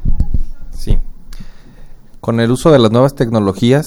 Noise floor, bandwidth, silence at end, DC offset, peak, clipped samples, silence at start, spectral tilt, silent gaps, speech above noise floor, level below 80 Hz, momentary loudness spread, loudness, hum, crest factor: -32 dBFS; 12.5 kHz; 0 s; under 0.1%; 0 dBFS; under 0.1%; 0 s; -7 dB/octave; none; 22 dB; -18 dBFS; 18 LU; -14 LUFS; none; 12 dB